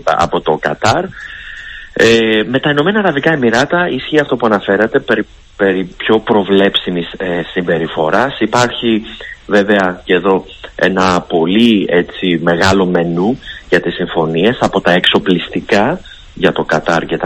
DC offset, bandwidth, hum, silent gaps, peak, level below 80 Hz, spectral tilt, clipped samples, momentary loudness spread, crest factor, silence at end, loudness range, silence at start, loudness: under 0.1%; 14 kHz; none; none; 0 dBFS; -40 dBFS; -5.5 dB/octave; 0.3%; 8 LU; 12 dB; 0 s; 2 LU; 0.05 s; -13 LUFS